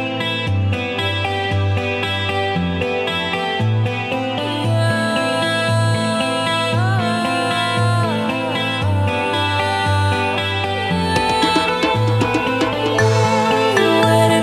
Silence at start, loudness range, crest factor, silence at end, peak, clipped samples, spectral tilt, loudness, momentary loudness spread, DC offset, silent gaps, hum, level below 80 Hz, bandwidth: 0 s; 3 LU; 16 dB; 0 s; -2 dBFS; under 0.1%; -5.5 dB/octave; -17 LUFS; 5 LU; under 0.1%; none; none; -46 dBFS; 13.5 kHz